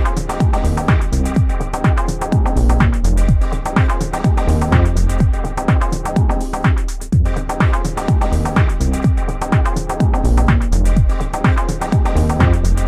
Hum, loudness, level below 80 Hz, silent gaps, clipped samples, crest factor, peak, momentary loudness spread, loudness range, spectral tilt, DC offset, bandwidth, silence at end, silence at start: none; -16 LUFS; -16 dBFS; none; under 0.1%; 14 dB; 0 dBFS; 4 LU; 1 LU; -7 dB/octave; under 0.1%; 13 kHz; 0 s; 0 s